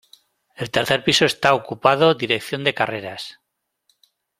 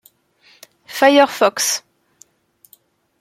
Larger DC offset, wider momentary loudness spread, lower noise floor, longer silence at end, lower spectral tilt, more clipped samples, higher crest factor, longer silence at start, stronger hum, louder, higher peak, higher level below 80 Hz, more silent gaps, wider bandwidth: neither; first, 16 LU vs 12 LU; first, -68 dBFS vs -57 dBFS; second, 1.1 s vs 1.4 s; first, -4 dB/octave vs -1 dB/octave; neither; about the same, 20 dB vs 18 dB; second, 0.6 s vs 0.9 s; neither; second, -19 LUFS vs -15 LUFS; about the same, -2 dBFS vs -2 dBFS; first, -58 dBFS vs -70 dBFS; neither; about the same, 16 kHz vs 16.5 kHz